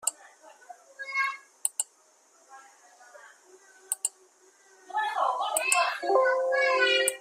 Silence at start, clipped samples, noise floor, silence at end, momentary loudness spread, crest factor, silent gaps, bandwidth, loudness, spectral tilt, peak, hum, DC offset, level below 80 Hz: 0.05 s; under 0.1%; -62 dBFS; 0 s; 11 LU; 24 dB; none; 15.5 kHz; -27 LUFS; 2.5 dB/octave; -6 dBFS; none; under 0.1%; -84 dBFS